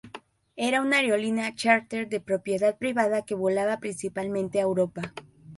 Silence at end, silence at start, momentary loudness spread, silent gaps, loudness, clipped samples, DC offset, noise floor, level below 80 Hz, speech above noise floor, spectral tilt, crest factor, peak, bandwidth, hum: 0 s; 0.05 s; 14 LU; none; -26 LUFS; under 0.1%; under 0.1%; -48 dBFS; -66 dBFS; 22 dB; -4.5 dB/octave; 20 dB; -8 dBFS; 11.5 kHz; none